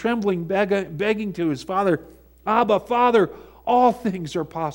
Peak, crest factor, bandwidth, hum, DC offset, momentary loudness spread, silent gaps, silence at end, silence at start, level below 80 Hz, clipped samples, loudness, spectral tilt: -4 dBFS; 18 dB; 16.5 kHz; none; under 0.1%; 9 LU; none; 0 s; 0 s; -54 dBFS; under 0.1%; -21 LUFS; -6.5 dB/octave